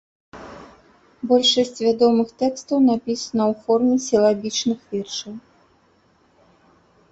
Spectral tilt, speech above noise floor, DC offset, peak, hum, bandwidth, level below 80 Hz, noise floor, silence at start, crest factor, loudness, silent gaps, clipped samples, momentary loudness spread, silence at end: -4 dB/octave; 40 dB; under 0.1%; -4 dBFS; none; 8.2 kHz; -62 dBFS; -59 dBFS; 0.35 s; 18 dB; -20 LUFS; none; under 0.1%; 21 LU; 1.7 s